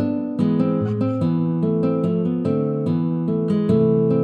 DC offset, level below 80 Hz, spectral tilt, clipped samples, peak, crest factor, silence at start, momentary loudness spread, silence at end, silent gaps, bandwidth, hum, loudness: under 0.1%; -60 dBFS; -11 dB/octave; under 0.1%; -6 dBFS; 14 dB; 0 s; 4 LU; 0 s; none; 4.8 kHz; none; -20 LUFS